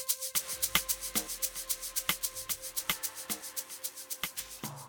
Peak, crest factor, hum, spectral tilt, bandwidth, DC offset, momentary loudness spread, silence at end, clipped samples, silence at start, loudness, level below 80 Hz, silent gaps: -8 dBFS; 28 dB; none; 0 dB/octave; over 20 kHz; under 0.1%; 9 LU; 0 s; under 0.1%; 0 s; -33 LUFS; -60 dBFS; none